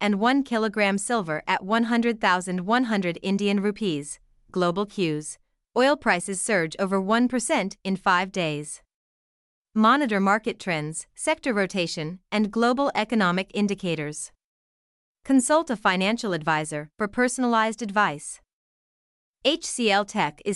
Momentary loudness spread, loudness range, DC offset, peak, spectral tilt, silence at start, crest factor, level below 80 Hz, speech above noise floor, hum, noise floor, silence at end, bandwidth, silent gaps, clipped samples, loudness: 11 LU; 2 LU; under 0.1%; -6 dBFS; -4 dB/octave; 0 s; 18 dB; -60 dBFS; over 66 dB; none; under -90 dBFS; 0 s; 12 kHz; 8.94-9.65 s, 14.44-15.15 s, 18.53-19.34 s; under 0.1%; -24 LUFS